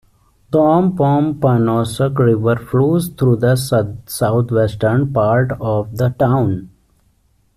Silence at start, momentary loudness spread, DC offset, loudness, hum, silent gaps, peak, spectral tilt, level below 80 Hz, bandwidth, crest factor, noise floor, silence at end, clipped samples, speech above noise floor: 0.5 s; 6 LU; under 0.1%; -16 LUFS; none; none; -2 dBFS; -7.5 dB/octave; -44 dBFS; 14.5 kHz; 12 dB; -58 dBFS; 0.9 s; under 0.1%; 43 dB